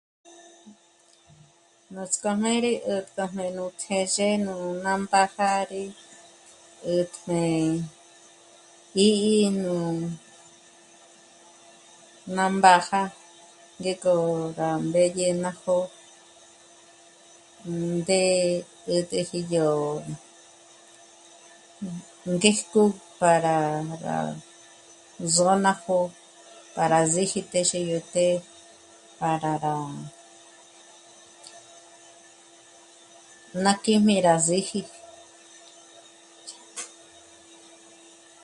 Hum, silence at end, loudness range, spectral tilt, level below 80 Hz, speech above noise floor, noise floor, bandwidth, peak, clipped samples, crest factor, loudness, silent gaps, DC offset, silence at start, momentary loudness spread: none; 1.55 s; 7 LU; -4 dB/octave; -68 dBFS; 35 dB; -59 dBFS; 11.5 kHz; 0 dBFS; under 0.1%; 26 dB; -24 LUFS; none; under 0.1%; 0.65 s; 18 LU